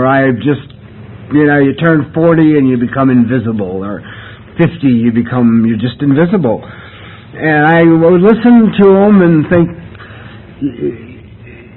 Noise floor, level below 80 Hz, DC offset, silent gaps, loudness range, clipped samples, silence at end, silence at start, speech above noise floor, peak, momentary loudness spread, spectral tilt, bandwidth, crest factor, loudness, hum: -33 dBFS; -42 dBFS; under 0.1%; none; 4 LU; under 0.1%; 0.15 s; 0 s; 24 dB; 0 dBFS; 20 LU; -11.5 dB/octave; 4.2 kHz; 10 dB; -10 LUFS; none